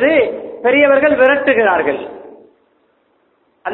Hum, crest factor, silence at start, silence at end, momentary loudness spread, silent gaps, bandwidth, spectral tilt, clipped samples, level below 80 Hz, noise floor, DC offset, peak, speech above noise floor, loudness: none; 14 dB; 0 s; 0 s; 14 LU; none; 4.1 kHz; -8 dB/octave; under 0.1%; -54 dBFS; -59 dBFS; under 0.1%; 0 dBFS; 47 dB; -13 LUFS